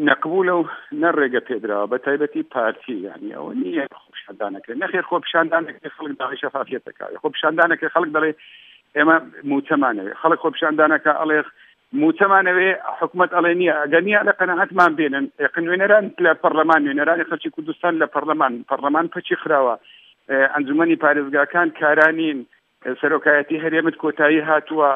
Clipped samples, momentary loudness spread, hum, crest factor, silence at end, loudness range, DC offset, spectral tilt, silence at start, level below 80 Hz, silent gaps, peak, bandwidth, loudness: under 0.1%; 13 LU; none; 18 dB; 0 s; 7 LU; under 0.1%; -7 dB/octave; 0 s; -78 dBFS; none; 0 dBFS; 5.6 kHz; -19 LUFS